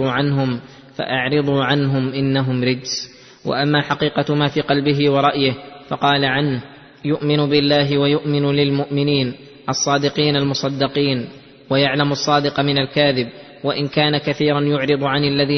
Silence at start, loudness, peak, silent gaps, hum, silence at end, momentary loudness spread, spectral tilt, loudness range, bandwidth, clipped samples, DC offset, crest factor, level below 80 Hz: 0 s; -18 LUFS; -2 dBFS; none; none; 0 s; 9 LU; -5.5 dB/octave; 2 LU; 6.4 kHz; under 0.1%; under 0.1%; 16 dB; -52 dBFS